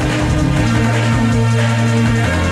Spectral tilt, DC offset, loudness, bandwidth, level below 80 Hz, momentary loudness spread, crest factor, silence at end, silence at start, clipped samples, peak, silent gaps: -6 dB/octave; under 0.1%; -14 LUFS; 12 kHz; -26 dBFS; 1 LU; 10 dB; 0 s; 0 s; under 0.1%; -4 dBFS; none